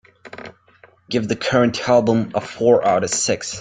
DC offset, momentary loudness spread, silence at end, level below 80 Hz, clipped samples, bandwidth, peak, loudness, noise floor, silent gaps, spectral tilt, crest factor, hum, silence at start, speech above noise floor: under 0.1%; 21 LU; 0 s; -56 dBFS; under 0.1%; 9.6 kHz; -2 dBFS; -18 LUFS; -52 dBFS; none; -4 dB/octave; 18 dB; none; 0.25 s; 34 dB